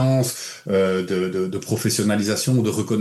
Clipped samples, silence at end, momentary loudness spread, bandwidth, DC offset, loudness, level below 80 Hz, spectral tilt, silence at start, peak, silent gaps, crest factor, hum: under 0.1%; 0 s; 5 LU; 13 kHz; under 0.1%; -21 LUFS; -64 dBFS; -5 dB/octave; 0 s; -10 dBFS; none; 12 dB; none